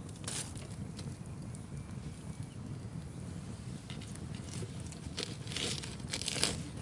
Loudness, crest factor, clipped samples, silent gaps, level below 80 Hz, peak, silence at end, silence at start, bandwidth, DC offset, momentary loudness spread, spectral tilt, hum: -40 LUFS; 32 dB; under 0.1%; none; -56 dBFS; -10 dBFS; 0 s; 0 s; 11.5 kHz; under 0.1%; 11 LU; -3.5 dB/octave; none